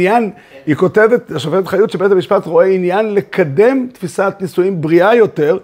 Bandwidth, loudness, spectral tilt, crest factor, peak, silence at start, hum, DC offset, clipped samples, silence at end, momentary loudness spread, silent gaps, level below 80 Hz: 16 kHz; -13 LUFS; -7 dB/octave; 12 dB; 0 dBFS; 0 s; none; under 0.1%; under 0.1%; 0 s; 7 LU; none; -58 dBFS